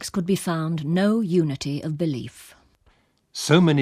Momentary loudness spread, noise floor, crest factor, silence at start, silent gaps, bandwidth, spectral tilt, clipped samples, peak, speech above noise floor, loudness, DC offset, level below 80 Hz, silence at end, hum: 12 LU; -62 dBFS; 20 dB; 0 s; none; 15.5 kHz; -6 dB/octave; under 0.1%; -2 dBFS; 40 dB; -23 LUFS; under 0.1%; -58 dBFS; 0 s; none